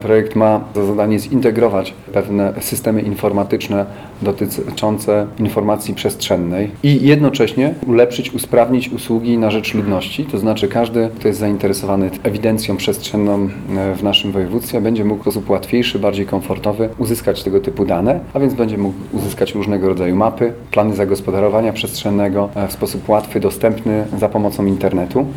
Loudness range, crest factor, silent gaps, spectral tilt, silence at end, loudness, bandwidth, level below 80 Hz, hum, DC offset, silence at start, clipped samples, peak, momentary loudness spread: 3 LU; 16 dB; none; -6 dB/octave; 0 s; -16 LUFS; 17.5 kHz; -42 dBFS; none; under 0.1%; 0 s; under 0.1%; 0 dBFS; 6 LU